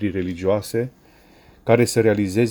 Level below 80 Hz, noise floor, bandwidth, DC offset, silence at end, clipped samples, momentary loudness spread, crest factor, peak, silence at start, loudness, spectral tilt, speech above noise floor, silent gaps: -52 dBFS; -51 dBFS; over 20 kHz; under 0.1%; 0 s; under 0.1%; 11 LU; 20 dB; -2 dBFS; 0 s; -20 LUFS; -6 dB/octave; 31 dB; none